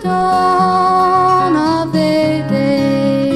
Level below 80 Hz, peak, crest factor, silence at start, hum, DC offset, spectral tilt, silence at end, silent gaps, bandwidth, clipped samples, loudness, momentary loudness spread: -44 dBFS; -2 dBFS; 10 dB; 0 s; none; under 0.1%; -6.5 dB/octave; 0 s; none; 13.5 kHz; under 0.1%; -13 LUFS; 3 LU